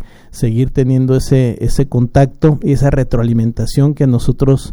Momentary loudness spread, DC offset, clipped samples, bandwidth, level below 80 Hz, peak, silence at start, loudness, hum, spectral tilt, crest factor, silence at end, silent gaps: 4 LU; under 0.1%; under 0.1%; 12.5 kHz; -24 dBFS; 0 dBFS; 0 s; -13 LUFS; none; -8 dB/octave; 12 dB; 0 s; none